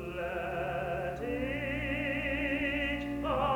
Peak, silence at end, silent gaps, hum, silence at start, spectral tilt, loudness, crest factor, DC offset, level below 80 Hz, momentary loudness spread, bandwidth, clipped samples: -18 dBFS; 0 s; none; none; 0 s; -6.5 dB/octave; -33 LUFS; 16 dB; under 0.1%; -46 dBFS; 4 LU; over 20 kHz; under 0.1%